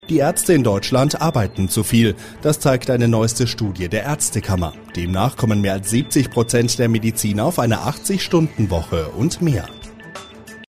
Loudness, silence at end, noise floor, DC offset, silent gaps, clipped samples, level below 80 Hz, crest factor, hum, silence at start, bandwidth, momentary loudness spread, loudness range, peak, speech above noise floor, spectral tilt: -18 LUFS; 0.05 s; -38 dBFS; 0.5%; none; under 0.1%; -40 dBFS; 16 dB; none; 0.05 s; 15.5 kHz; 8 LU; 3 LU; -4 dBFS; 20 dB; -5 dB/octave